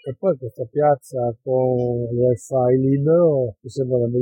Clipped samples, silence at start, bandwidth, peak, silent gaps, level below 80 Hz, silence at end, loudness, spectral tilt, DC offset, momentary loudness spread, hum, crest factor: under 0.1%; 0.05 s; 11 kHz; -6 dBFS; none; -56 dBFS; 0 s; -20 LUFS; -9 dB/octave; under 0.1%; 9 LU; none; 12 dB